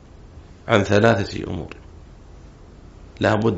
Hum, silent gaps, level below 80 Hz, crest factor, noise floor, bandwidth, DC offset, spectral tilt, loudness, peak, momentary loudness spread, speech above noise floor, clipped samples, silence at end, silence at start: none; none; -44 dBFS; 22 dB; -43 dBFS; 8 kHz; under 0.1%; -5 dB/octave; -20 LUFS; -2 dBFS; 21 LU; 24 dB; under 0.1%; 0 s; 0.2 s